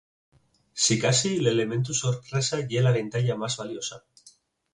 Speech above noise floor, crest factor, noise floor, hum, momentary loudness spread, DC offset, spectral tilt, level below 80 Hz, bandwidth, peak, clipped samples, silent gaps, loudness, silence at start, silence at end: 33 dB; 18 dB; -58 dBFS; none; 10 LU; under 0.1%; -4 dB/octave; -62 dBFS; 11 kHz; -10 dBFS; under 0.1%; none; -25 LUFS; 0.75 s; 0.45 s